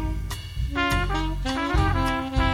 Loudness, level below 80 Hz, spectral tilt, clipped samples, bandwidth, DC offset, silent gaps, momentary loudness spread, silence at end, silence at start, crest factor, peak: -25 LUFS; -28 dBFS; -5.5 dB/octave; under 0.1%; 15.5 kHz; under 0.1%; none; 8 LU; 0 s; 0 s; 14 dB; -10 dBFS